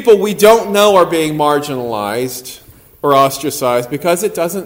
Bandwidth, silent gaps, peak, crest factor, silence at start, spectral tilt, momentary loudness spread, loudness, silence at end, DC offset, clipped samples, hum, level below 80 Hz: 16.5 kHz; none; 0 dBFS; 12 dB; 0 s; -4 dB/octave; 11 LU; -13 LUFS; 0 s; under 0.1%; 0.3%; none; -50 dBFS